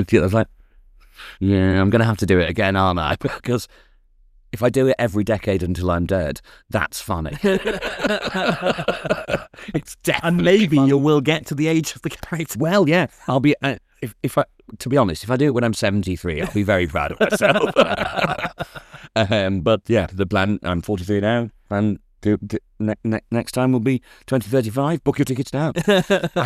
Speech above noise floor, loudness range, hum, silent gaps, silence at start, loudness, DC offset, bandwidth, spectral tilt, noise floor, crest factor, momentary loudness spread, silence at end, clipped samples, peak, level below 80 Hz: 34 dB; 4 LU; none; none; 0 s; -20 LUFS; under 0.1%; 15.5 kHz; -6 dB/octave; -53 dBFS; 18 dB; 10 LU; 0 s; under 0.1%; -2 dBFS; -44 dBFS